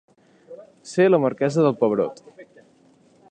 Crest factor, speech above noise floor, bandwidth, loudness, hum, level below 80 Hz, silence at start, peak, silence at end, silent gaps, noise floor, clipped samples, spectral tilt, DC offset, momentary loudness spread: 18 dB; 37 dB; 9.6 kHz; -20 LUFS; none; -72 dBFS; 0.5 s; -6 dBFS; 0.9 s; none; -56 dBFS; under 0.1%; -7 dB/octave; under 0.1%; 11 LU